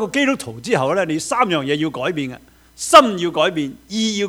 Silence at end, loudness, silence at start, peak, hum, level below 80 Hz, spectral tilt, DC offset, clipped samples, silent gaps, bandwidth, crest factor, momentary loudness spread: 0 s; -17 LUFS; 0 s; 0 dBFS; none; -54 dBFS; -4 dB/octave; under 0.1%; 0.1%; none; 19 kHz; 18 dB; 14 LU